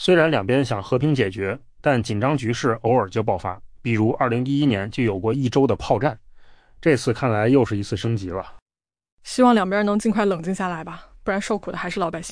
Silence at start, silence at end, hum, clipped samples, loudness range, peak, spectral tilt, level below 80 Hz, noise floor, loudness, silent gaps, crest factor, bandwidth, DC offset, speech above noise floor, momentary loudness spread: 0 s; 0 s; none; under 0.1%; 1 LU; -6 dBFS; -6.5 dB/octave; -48 dBFS; -46 dBFS; -21 LUFS; 8.62-8.66 s, 9.12-9.17 s; 16 dB; 10.5 kHz; under 0.1%; 25 dB; 10 LU